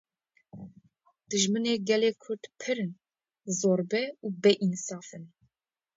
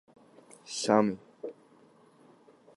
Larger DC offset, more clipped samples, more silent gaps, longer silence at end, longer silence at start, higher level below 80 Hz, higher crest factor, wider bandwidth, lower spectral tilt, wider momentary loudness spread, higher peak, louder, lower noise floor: neither; neither; neither; second, 0.7 s vs 1.25 s; second, 0.55 s vs 0.7 s; about the same, -76 dBFS vs -76 dBFS; second, 20 dB vs 26 dB; second, 8 kHz vs 11.5 kHz; about the same, -4 dB/octave vs -4.5 dB/octave; first, 22 LU vs 19 LU; about the same, -10 dBFS vs -8 dBFS; about the same, -29 LUFS vs -29 LUFS; first, -83 dBFS vs -60 dBFS